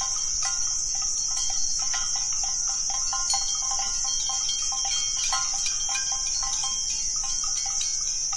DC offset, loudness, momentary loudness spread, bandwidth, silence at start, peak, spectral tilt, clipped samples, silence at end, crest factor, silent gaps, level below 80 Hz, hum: under 0.1%; -24 LUFS; 1 LU; 11.5 kHz; 0 s; -12 dBFS; 2.5 dB/octave; under 0.1%; 0 s; 14 dB; none; -44 dBFS; none